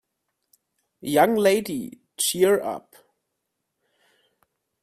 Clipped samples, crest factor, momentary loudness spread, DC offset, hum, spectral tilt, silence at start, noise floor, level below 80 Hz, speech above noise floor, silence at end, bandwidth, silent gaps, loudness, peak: under 0.1%; 22 dB; 19 LU; under 0.1%; none; -3.5 dB/octave; 1.05 s; -80 dBFS; -68 dBFS; 58 dB; 2.05 s; 16 kHz; none; -22 LUFS; -4 dBFS